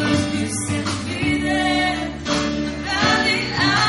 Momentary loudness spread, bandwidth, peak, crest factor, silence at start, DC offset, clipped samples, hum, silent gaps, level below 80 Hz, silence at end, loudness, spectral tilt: 6 LU; 11.5 kHz; -6 dBFS; 14 dB; 0 s; under 0.1%; under 0.1%; none; none; -40 dBFS; 0 s; -20 LUFS; -4 dB/octave